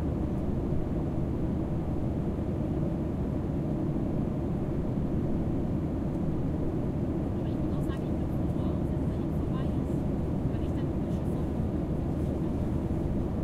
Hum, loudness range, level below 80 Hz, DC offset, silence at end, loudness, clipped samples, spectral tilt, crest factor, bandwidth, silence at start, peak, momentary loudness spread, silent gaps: none; 1 LU; -38 dBFS; under 0.1%; 0 s; -31 LUFS; under 0.1%; -10 dB/octave; 12 dB; 12.5 kHz; 0 s; -18 dBFS; 1 LU; none